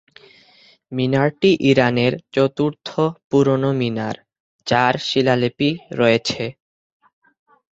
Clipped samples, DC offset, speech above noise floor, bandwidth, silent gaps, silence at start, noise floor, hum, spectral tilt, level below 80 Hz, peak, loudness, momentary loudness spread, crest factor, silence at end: under 0.1%; under 0.1%; 34 dB; 8 kHz; 3.24-3.30 s, 4.40-4.59 s; 0.9 s; -52 dBFS; none; -6 dB/octave; -56 dBFS; -2 dBFS; -19 LUFS; 11 LU; 18 dB; 1.2 s